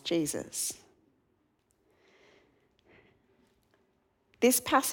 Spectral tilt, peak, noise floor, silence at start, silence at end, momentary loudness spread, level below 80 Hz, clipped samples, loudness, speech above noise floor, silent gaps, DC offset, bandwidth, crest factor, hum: -2.5 dB/octave; -10 dBFS; -73 dBFS; 0.05 s; 0 s; 10 LU; -72 dBFS; under 0.1%; -29 LUFS; 45 dB; none; under 0.1%; 19 kHz; 24 dB; none